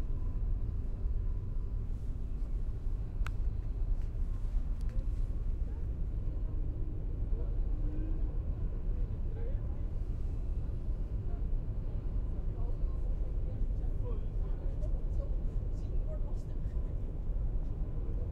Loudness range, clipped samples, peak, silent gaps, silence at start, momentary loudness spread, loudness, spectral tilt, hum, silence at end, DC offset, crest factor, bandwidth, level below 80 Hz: 1 LU; under 0.1%; -20 dBFS; none; 0 s; 2 LU; -39 LUFS; -9.5 dB/octave; none; 0 s; under 0.1%; 12 dB; 3 kHz; -34 dBFS